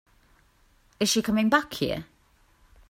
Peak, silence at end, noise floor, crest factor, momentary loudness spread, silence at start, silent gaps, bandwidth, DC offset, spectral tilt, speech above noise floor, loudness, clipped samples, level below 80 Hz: -6 dBFS; 0.85 s; -62 dBFS; 24 dB; 8 LU; 1 s; none; 16 kHz; under 0.1%; -3.5 dB/octave; 37 dB; -25 LUFS; under 0.1%; -56 dBFS